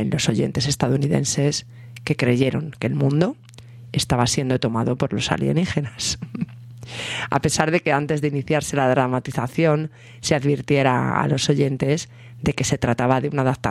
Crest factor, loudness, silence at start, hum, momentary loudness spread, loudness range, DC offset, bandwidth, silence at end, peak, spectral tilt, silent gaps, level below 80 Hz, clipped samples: 18 dB; -21 LUFS; 0 s; none; 9 LU; 2 LU; under 0.1%; 13.5 kHz; 0 s; -2 dBFS; -5 dB/octave; none; -48 dBFS; under 0.1%